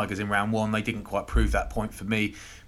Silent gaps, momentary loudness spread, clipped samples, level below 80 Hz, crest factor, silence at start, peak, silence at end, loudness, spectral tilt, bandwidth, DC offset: none; 6 LU; under 0.1%; -34 dBFS; 16 dB; 0 s; -12 dBFS; 0 s; -28 LUFS; -5.5 dB/octave; 13.5 kHz; under 0.1%